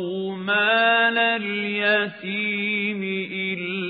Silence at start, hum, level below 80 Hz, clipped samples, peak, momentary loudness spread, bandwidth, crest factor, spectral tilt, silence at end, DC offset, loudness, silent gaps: 0 s; none; -78 dBFS; under 0.1%; -8 dBFS; 9 LU; 4.9 kHz; 16 dB; -9 dB/octave; 0 s; under 0.1%; -21 LUFS; none